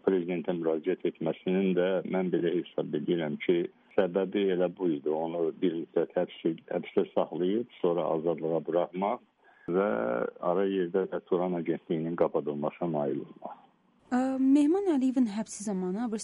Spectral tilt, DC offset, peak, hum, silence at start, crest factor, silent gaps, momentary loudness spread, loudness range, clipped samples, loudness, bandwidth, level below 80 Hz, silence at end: -7 dB/octave; under 0.1%; -12 dBFS; none; 0.05 s; 16 dB; none; 6 LU; 2 LU; under 0.1%; -30 LUFS; 11 kHz; -74 dBFS; 0 s